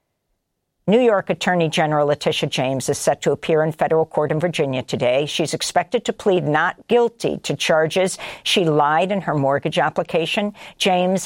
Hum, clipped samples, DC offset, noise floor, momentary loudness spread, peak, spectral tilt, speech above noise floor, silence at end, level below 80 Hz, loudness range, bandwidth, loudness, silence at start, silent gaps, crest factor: none; under 0.1%; under 0.1%; -73 dBFS; 5 LU; -4 dBFS; -4.5 dB/octave; 54 dB; 0 s; -58 dBFS; 1 LU; 16.5 kHz; -19 LUFS; 0.85 s; none; 16 dB